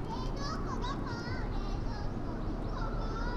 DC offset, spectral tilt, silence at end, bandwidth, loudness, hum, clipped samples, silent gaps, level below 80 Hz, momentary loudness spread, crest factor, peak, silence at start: under 0.1%; -6.5 dB/octave; 0 s; 7.6 kHz; -38 LUFS; none; under 0.1%; none; -38 dBFS; 2 LU; 10 dB; -24 dBFS; 0 s